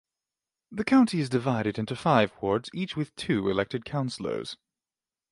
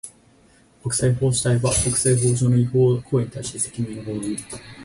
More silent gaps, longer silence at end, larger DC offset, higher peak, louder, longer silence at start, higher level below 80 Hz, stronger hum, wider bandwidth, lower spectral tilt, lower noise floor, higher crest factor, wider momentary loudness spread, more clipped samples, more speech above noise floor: neither; first, 0.75 s vs 0 s; neither; about the same, -6 dBFS vs -8 dBFS; second, -27 LUFS vs -21 LUFS; first, 0.7 s vs 0.05 s; second, -60 dBFS vs -44 dBFS; neither; about the same, 11.5 kHz vs 11.5 kHz; about the same, -6.5 dB/octave vs -5.5 dB/octave; first, under -90 dBFS vs -55 dBFS; first, 22 dB vs 14 dB; about the same, 11 LU vs 11 LU; neither; first, over 63 dB vs 34 dB